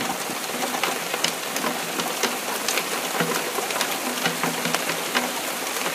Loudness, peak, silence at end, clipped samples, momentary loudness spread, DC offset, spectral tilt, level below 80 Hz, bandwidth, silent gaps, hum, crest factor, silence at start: -24 LUFS; -2 dBFS; 0 s; under 0.1%; 2 LU; under 0.1%; -1.5 dB/octave; -74 dBFS; 16 kHz; none; none; 24 dB; 0 s